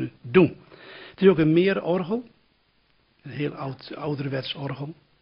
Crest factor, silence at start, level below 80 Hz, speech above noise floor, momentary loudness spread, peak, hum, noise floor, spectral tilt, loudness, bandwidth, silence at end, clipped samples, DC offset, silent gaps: 20 dB; 0 s; -58 dBFS; 42 dB; 20 LU; -4 dBFS; none; -65 dBFS; -10.5 dB/octave; -24 LUFS; 5.6 kHz; 0.3 s; under 0.1%; under 0.1%; none